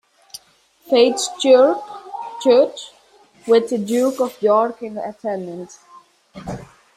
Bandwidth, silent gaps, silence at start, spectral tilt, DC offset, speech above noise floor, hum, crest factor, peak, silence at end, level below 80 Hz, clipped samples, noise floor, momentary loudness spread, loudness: 14.5 kHz; none; 0.35 s; -4 dB/octave; under 0.1%; 38 dB; none; 18 dB; -2 dBFS; 0.35 s; -58 dBFS; under 0.1%; -55 dBFS; 23 LU; -17 LUFS